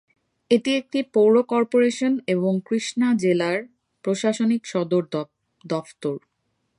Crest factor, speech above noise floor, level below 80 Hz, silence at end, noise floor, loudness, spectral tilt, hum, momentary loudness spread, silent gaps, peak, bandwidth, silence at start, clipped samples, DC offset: 16 dB; 52 dB; -72 dBFS; 0.6 s; -73 dBFS; -22 LUFS; -5.5 dB/octave; none; 11 LU; none; -6 dBFS; 11 kHz; 0.5 s; under 0.1%; under 0.1%